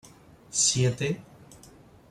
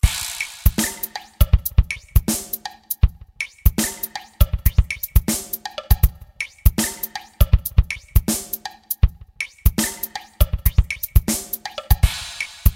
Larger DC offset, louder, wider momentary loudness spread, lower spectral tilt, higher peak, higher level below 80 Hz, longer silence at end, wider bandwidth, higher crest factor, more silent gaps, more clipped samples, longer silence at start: neither; second, -25 LUFS vs -22 LUFS; about the same, 10 LU vs 10 LU; about the same, -3 dB/octave vs -4 dB/octave; second, -8 dBFS vs 0 dBFS; second, -60 dBFS vs -22 dBFS; first, 0.55 s vs 0 s; second, 14 kHz vs 17 kHz; about the same, 22 dB vs 20 dB; neither; neither; first, 0.5 s vs 0.05 s